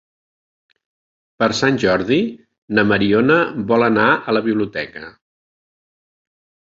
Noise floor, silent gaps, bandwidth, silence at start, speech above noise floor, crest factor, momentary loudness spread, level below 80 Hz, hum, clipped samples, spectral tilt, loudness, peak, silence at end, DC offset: under -90 dBFS; 2.58-2.68 s; 7.8 kHz; 1.4 s; over 74 dB; 18 dB; 10 LU; -52 dBFS; none; under 0.1%; -5.5 dB/octave; -17 LUFS; 0 dBFS; 1.65 s; under 0.1%